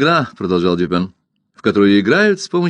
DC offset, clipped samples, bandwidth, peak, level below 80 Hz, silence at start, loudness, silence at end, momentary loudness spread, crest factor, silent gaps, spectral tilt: under 0.1%; under 0.1%; 9.6 kHz; 0 dBFS; -52 dBFS; 0 s; -15 LUFS; 0 s; 9 LU; 14 dB; none; -6 dB/octave